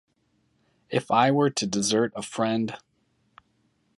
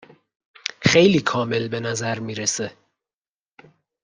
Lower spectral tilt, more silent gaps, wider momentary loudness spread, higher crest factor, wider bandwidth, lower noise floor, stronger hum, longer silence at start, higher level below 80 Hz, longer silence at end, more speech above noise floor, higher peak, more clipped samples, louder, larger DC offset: about the same, -4.5 dB/octave vs -4 dB/octave; neither; second, 9 LU vs 16 LU; about the same, 20 dB vs 22 dB; about the same, 11.5 kHz vs 10.5 kHz; second, -69 dBFS vs under -90 dBFS; neither; about the same, 0.9 s vs 0.8 s; second, -68 dBFS vs -58 dBFS; second, 1.2 s vs 1.35 s; second, 45 dB vs over 70 dB; second, -6 dBFS vs -2 dBFS; neither; second, -25 LUFS vs -21 LUFS; neither